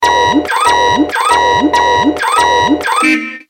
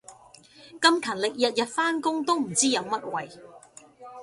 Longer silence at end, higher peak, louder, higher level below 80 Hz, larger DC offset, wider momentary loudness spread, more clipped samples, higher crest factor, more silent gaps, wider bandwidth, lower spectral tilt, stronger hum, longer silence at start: about the same, 0.1 s vs 0 s; first, 0 dBFS vs -6 dBFS; first, -10 LUFS vs -25 LUFS; first, -40 dBFS vs -72 dBFS; neither; second, 2 LU vs 12 LU; neither; second, 10 dB vs 22 dB; neither; first, 16.5 kHz vs 11.5 kHz; about the same, -3 dB/octave vs -2 dB/octave; neither; about the same, 0 s vs 0.1 s